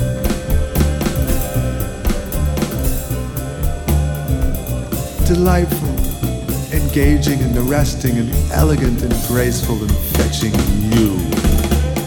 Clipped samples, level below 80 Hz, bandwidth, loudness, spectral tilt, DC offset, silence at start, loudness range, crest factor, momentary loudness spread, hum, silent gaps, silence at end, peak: under 0.1%; -20 dBFS; over 20 kHz; -17 LUFS; -6 dB/octave; under 0.1%; 0 s; 4 LU; 14 dB; 7 LU; none; none; 0 s; -2 dBFS